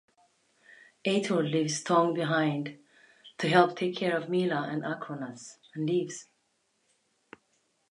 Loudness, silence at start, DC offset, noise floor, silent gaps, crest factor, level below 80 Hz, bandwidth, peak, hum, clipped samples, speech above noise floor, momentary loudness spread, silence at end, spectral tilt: -29 LUFS; 1.05 s; under 0.1%; -74 dBFS; none; 24 dB; -80 dBFS; 11 kHz; -6 dBFS; none; under 0.1%; 46 dB; 16 LU; 1.7 s; -5 dB/octave